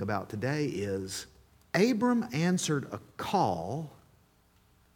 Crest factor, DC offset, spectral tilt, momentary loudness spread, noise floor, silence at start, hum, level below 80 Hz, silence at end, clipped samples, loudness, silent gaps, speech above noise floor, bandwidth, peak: 20 dB; under 0.1%; -5.5 dB/octave; 13 LU; -65 dBFS; 0 s; none; -64 dBFS; 1.05 s; under 0.1%; -31 LUFS; none; 35 dB; 18 kHz; -12 dBFS